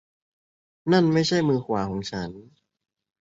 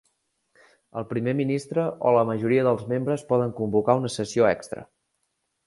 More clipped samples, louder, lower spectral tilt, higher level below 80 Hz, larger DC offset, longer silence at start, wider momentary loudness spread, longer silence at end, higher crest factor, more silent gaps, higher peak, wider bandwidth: neither; about the same, -24 LUFS vs -24 LUFS; about the same, -6 dB/octave vs -6.5 dB/octave; first, -56 dBFS vs -62 dBFS; neither; about the same, 0.85 s vs 0.95 s; first, 14 LU vs 9 LU; about the same, 0.8 s vs 0.85 s; about the same, 20 dB vs 20 dB; neither; about the same, -6 dBFS vs -4 dBFS; second, 7.8 kHz vs 11.5 kHz